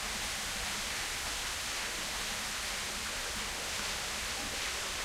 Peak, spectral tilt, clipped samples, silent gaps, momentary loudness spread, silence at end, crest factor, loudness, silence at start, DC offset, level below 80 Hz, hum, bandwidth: -22 dBFS; -0.5 dB/octave; under 0.1%; none; 1 LU; 0 s; 16 dB; -35 LUFS; 0 s; under 0.1%; -50 dBFS; none; 16 kHz